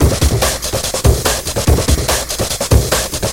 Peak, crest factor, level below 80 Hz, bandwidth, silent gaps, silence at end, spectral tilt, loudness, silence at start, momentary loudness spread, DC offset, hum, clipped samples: 0 dBFS; 14 dB; -18 dBFS; 17.5 kHz; none; 0 s; -4 dB/octave; -14 LUFS; 0 s; 4 LU; under 0.1%; none; under 0.1%